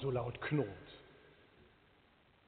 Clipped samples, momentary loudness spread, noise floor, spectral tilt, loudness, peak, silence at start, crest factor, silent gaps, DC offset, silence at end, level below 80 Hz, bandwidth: under 0.1%; 24 LU; -69 dBFS; -6 dB/octave; -39 LUFS; -22 dBFS; 0 s; 20 dB; none; under 0.1%; 1.2 s; -66 dBFS; 4.5 kHz